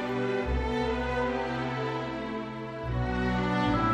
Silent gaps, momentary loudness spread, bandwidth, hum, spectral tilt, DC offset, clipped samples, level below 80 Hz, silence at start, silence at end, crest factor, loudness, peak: none; 8 LU; 9.4 kHz; none; -7 dB/octave; under 0.1%; under 0.1%; -40 dBFS; 0 s; 0 s; 16 dB; -30 LUFS; -14 dBFS